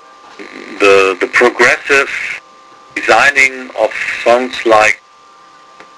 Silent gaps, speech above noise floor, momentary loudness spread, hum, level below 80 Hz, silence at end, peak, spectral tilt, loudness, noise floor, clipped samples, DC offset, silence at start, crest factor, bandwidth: none; 31 dB; 15 LU; none; -50 dBFS; 1 s; 0 dBFS; -2.5 dB/octave; -10 LUFS; -42 dBFS; 0.2%; under 0.1%; 0.4 s; 12 dB; 11 kHz